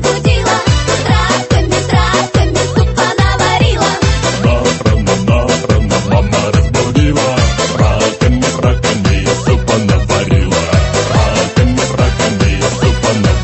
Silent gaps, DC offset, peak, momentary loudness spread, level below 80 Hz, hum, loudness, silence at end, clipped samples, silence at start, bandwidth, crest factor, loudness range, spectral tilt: none; under 0.1%; 0 dBFS; 1 LU; -18 dBFS; none; -12 LUFS; 0 s; under 0.1%; 0 s; 8.6 kHz; 10 dB; 0 LU; -5 dB/octave